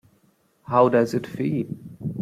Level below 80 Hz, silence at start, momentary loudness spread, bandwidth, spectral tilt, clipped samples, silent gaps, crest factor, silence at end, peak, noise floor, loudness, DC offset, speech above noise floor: -62 dBFS; 0.7 s; 15 LU; 15 kHz; -8 dB/octave; under 0.1%; none; 20 dB; 0 s; -4 dBFS; -63 dBFS; -23 LUFS; under 0.1%; 42 dB